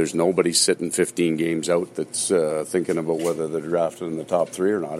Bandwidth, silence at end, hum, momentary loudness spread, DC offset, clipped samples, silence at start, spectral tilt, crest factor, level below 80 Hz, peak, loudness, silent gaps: 15 kHz; 0 s; none; 6 LU; under 0.1%; under 0.1%; 0 s; -4 dB/octave; 18 dB; -64 dBFS; -4 dBFS; -22 LUFS; none